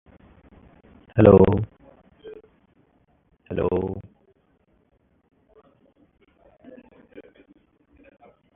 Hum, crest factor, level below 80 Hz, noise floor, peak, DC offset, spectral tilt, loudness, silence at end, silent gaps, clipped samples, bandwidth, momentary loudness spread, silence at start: none; 26 dB; -44 dBFS; -65 dBFS; 0 dBFS; under 0.1%; -13 dB/octave; -19 LUFS; 1.35 s; none; under 0.1%; 3.8 kHz; 31 LU; 1.15 s